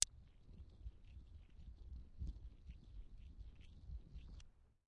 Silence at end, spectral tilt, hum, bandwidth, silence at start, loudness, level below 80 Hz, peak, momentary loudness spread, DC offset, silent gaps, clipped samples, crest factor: 0.1 s; -3.5 dB/octave; none; 7.6 kHz; 0 s; -55 LUFS; -56 dBFS; -10 dBFS; 10 LU; under 0.1%; none; under 0.1%; 42 dB